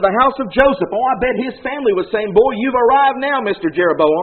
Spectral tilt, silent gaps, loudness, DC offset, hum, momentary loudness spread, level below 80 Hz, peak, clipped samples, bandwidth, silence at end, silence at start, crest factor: -3 dB/octave; none; -15 LUFS; 0.1%; none; 6 LU; -42 dBFS; 0 dBFS; under 0.1%; 4.5 kHz; 0 s; 0 s; 14 dB